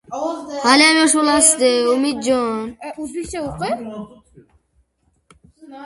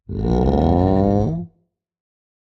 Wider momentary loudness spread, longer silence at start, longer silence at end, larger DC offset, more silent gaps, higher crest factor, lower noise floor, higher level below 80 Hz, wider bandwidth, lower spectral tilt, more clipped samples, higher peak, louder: first, 17 LU vs 11 LU; about the same, 0.1 s vs 0.1 s; second, 0 s vs 0.95 s; neither; neither; about the same, 18 dB vs 16 dB; about the same, -64 dBFS vs -65 dBFS; second, -50 dBFS vs -30 dBFS; first, 11.5 kHz vs 6.6 kHz; second, -1.5 dB/octave vs -10 dB/octave; neither; first, 0 dBFS vs -4 dBFS; about the same, -16 LUFS vs -18 LUFS